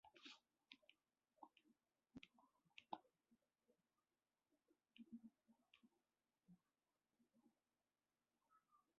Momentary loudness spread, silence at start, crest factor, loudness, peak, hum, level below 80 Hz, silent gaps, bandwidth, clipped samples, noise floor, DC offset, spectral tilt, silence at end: 9 LU; 0.05 s; 34 dB; -64 LUFS; -36 dBFS; none; under -90 dBFS; none; 5.6 kHz; under 0.1%; under -90 dBFS; under 0.1%; -2 dB/octave; 0.2 s